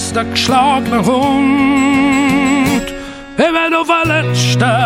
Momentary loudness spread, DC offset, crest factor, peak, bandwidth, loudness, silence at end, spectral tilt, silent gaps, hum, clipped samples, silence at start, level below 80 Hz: 4 LU; under 0.1%; 12 dB; -2 dBFS; 16.5 kHz; -12 LUFS; 0 s; -5 dB/octave; none; none; under 0.1%; 0 s; -40 dBFS